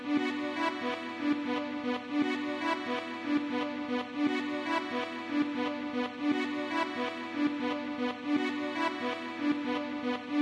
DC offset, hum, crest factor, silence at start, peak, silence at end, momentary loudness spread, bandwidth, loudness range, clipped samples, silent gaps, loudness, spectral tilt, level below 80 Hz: under 0.1%; none; 14 dB; 0 s; -18 dBFS; 0 s; 4 LU; 12 kHz; 0 LU; under 0.1%; none; -33 LUFS; -4.5 dB/octave; -76 dBFS